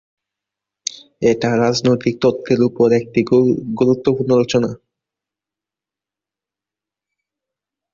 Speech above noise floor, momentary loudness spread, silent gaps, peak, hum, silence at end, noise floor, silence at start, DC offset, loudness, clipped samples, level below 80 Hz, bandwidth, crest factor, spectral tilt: 73 dB; 12 LU; none; -2 dBFS; 50 Hz at -55 dBFS; 3.15 s; -88 dBFS; 1.2 s; under 0.1%; -16 LUFS; under 0.1%; -54 dBFS; 7.8 kHz; 16 dB; -6 dB/octave